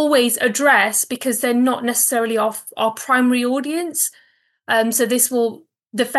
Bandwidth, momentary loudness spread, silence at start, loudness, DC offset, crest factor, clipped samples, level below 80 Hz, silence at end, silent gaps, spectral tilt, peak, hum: 13 kHz; 8 LU; 0 s; -17 LUFS; under 0.1%; 16 dB; under 0.1%; under -90 dBFS; 0 s; none; -2 dB/octave; -2 dBFS; none